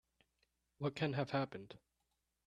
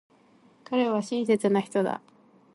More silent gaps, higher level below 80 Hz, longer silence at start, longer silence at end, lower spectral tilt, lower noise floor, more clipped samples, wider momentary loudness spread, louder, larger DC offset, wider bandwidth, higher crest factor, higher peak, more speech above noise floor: neither; about the same, -76 dBFS vs -76 dBFS; about the same, 0.8 s vs 0.7 s; first, 0.7 s vs 0.55 s; about the same, -7 dB/octave vs -6 dB/octave; first, -86 dBFS vs -59 dBFS; neither; first, 19 LU vs 7 LU; second, -41 LUFS vs -26 LUFS; neither; second, 9.8 kHz vs 11.5 kHz; first, 22 dB vs 16 dB; second, -22 dBFS vs -12 dBFS; first, 45 dB vs 34 dB